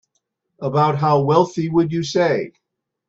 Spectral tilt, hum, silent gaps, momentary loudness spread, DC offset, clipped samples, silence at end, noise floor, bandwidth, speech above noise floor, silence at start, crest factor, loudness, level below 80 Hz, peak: -7 dB/octave; none; none; 8 LU; under 0.1%; under 0.1%; 0.6 s; -73 dBFS; 7.8 kHz; 55 dB; 0.6 s; 18 dB; -18 LUFS; -58 dBFS; -2 dBFS